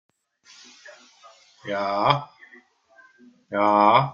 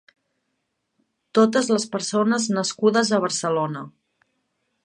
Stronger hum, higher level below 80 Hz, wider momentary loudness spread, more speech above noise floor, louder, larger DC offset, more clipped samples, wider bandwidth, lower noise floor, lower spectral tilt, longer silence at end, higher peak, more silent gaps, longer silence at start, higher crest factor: neither; first, -68 dBFS vs -74 dBFS; first, 27 LU vs 7 LU; second, 36 dB vs 55 dB; about the same, -21 LUFS vs -21 LUFS; neither; neither; second, 7.4 kHz vs 11 kHz; second, -56 dBFS vs -76 dBFS; first, -6 dB/octave vs -4 dB/octave; second, 0 s vs 0.95 s; about the same, -2 dBFS vs -4 dBFS; neither; second, 0.85 s vs 1.35 s; about the same, 22 dB vs 20 dB